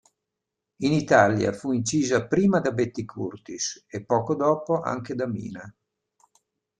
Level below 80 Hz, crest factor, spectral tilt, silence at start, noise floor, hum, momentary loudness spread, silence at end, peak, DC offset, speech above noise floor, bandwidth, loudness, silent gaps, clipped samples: -60 dBFS; 22 dB; -5.5 dB/octave; 0.8 s; -85 dBFS; none; 15 LU; 1.1 s; -4 dBFS; under 0.1%; 61 dB; 10 kHz; -24 LUFS; none; under 0.1%